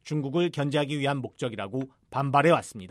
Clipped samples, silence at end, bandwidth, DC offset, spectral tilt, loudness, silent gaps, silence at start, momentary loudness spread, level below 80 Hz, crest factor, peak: under 0.1%; 0 s; 13 kHz; under 0.1%; -6 dB/octave; -27 LUFS; none; 0.05 s; 12 LU; -68 dBFS; 20 dB; -8 dBFS